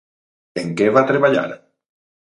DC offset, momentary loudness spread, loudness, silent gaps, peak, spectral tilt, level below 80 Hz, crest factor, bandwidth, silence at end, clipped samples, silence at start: under 0.1%; 14 LU; -17 LUFS; none; 0 dBFS; -6.5 dB/octave; -64 dBFS; 18 dB; 11 kHz; 0.7 s; under 0.1%; 0.55 s